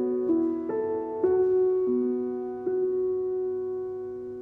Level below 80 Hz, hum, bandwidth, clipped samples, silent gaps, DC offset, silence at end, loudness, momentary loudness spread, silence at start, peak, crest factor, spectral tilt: -64 dBFS; none; 2.4 kHz; under 0.1%; none; under 0.1%; 0 s; -27 LUFS; 9 LU; 0 s; -14 dBFS; 12 dB; -10.5 dB/octave